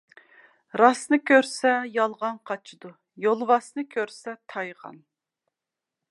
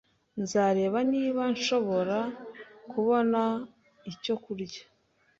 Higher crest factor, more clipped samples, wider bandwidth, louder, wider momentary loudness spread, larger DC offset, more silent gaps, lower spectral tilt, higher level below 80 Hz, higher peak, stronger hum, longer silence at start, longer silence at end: first, 22 dB vs 16 dB; neither; first, 11.5 kHz vs 7.8 kHz; first, -24 LUFS vs -29 LUFS; second, 16 LU vs 19 LU; neither; neither; second, -3.5 dB/octave vs -5 dB/octave; second, -84 dBFS vs -70 dBFS; first, -2 dBFS vs -14 dBFS; neither; first, 0.75 s vs 0.35 s; first, 1.15 s vs 0.55 s